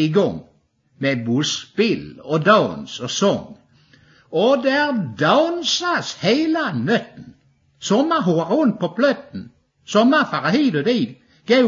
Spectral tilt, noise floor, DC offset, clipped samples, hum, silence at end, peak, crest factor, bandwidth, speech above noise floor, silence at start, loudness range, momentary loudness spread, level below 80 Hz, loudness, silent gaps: -5 dB/octave; -59 dBFS; under 0.1%; under 0.1%; none; 0 s; -2 dBFS; 18 dB; 7.6 kHz; 41 dB; 0 s; 2 LU; 11 LU; -62 dBFS; -19 LUFS; none